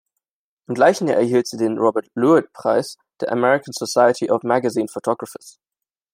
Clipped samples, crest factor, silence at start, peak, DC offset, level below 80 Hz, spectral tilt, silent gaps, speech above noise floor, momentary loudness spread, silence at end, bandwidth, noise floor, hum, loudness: under 0.1%; 18 dB; 0.7 s; -2 dBFS; under 0.1%; -70 dBFS; -5 dB/octave; none; 64 dB; 11 LU; 0.65 s; 16 kHz; -82 dBFS; none; -19 LUFS